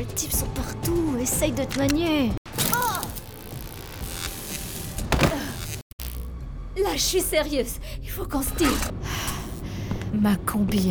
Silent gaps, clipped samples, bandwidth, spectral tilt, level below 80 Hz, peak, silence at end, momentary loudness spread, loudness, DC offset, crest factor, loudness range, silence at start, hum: 2.37-2.45 s, 5.82-5.98 s; under 0.1%; over 20 kHz; -4 dB/octave; -36 dBFS; -4 dBFS; 0 s; 13 LU; -26 LUFS; under 0.1%; 22 dB; 5 LU; 0 s; none